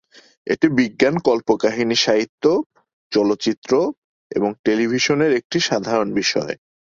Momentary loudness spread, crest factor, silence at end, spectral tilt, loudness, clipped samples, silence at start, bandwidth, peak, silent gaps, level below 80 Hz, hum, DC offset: 7 LU; 18 dB; 0.3 s; -4.5 dB/octave; -19 LUFS; under 0.1%; 0.45 s; 7.6 kHz; -2 dBFS; 2.29-2.38 s, 2.66-2.70 s, 2.93-3.10 s, 3.57-3.62 s, 3.97-4.30 s, 4.59-4.64 s, 5.44-5.50 s; -58 dBFS; none; under 0.1%